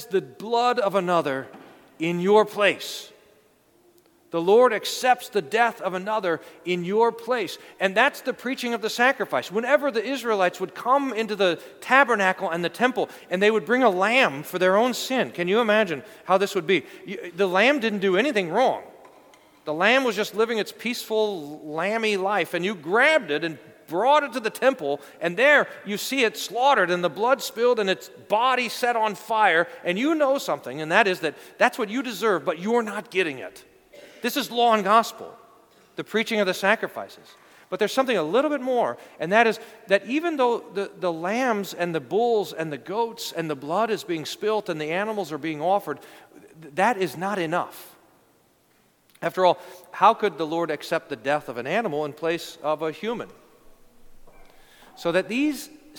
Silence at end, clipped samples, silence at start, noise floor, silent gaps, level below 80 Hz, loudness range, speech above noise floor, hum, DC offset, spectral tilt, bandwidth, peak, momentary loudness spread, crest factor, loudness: 0 s; under 0.1%; 0 s; -62 dBFS; none; -68 dBFS; 5 LU; 39 dB; none; under 0.1%; -4 dB/octave; 19 kHz; -2 dBFS; 11 LU; 22 dB; -23 LUFS